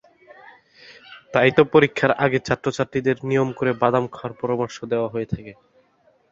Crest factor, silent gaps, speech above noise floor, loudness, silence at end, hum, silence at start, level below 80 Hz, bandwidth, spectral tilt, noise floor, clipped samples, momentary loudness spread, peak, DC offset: 20 dB; none; 40 dB; -21 LUFS; 0.8 s; none; 0.9 s; -54 dBFS; 7.8 kHz; -6.5 dB/octave; -60 dBFS; under 0.1%; 12 LU; -2 dBFS; under 0.1%